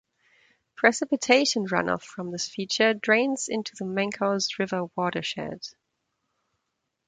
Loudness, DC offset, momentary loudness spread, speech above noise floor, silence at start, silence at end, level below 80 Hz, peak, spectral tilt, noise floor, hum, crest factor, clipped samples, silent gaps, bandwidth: -25 LUFS; under 0.1%; 11 LU; 54 dB; 0.8 s; 1.4 s; -68 dBFS; -4 dBFS; -3.5 dB/octave; -80 dBFS; none; 24 dB; under 0.1%; none; 9.6 kHz